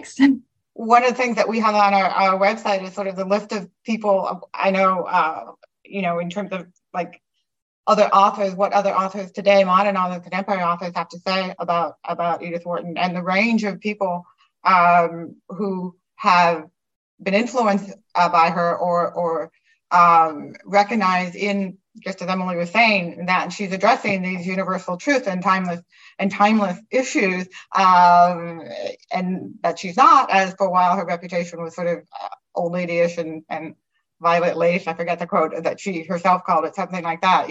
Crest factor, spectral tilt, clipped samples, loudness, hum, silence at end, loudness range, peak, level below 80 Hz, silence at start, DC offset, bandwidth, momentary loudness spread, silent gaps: 20 dB; -5.5 dB/octave; under 0.1%; -19 LUFS; none; 0 s; 5 LU; 0 dBFS; -72 dBFS; 0 s; under 0.1%; 8.6 kHz; 14 LU; 7.62-7.84 s, 16.96-17.18 s